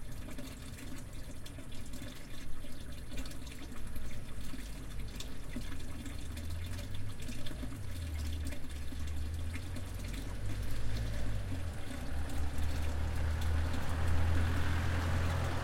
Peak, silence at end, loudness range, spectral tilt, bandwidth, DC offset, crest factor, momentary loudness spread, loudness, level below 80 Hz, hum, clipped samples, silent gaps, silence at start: -20 dBFS; 0 s; 11 LU; -5.5 dB/octave; 16 kHz; under 0.1%; 14 dB; 13 LU; -40 LUFS; -42 dBFS; none; under 0.1%; none; 0 s